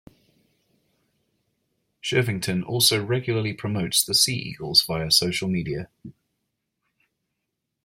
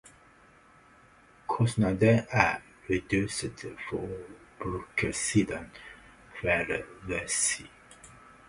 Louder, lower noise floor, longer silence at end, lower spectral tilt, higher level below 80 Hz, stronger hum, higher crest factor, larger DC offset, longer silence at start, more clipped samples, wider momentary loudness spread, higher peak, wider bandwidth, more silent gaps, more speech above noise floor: first, -22 LUFS vs -29 LUFS; first, -81 dBFS vs -58 dBFS; first, 1.75 s vs 0.4 s; second, -3 dB/octave vs -4.5 dB/octave; second, -58 dBFS vs -52 dBFS; neither; about the same, 24 dB vs 26 dB; neither; first, 2.05 s vs 0.05 s; neither; second, 11 LU vs 19 LU; about the same, -4 dBFS vs -6 dBFS; first, 16.5 kHz vs 11.5 kHz; neither; first, 57 dB vs 29 dB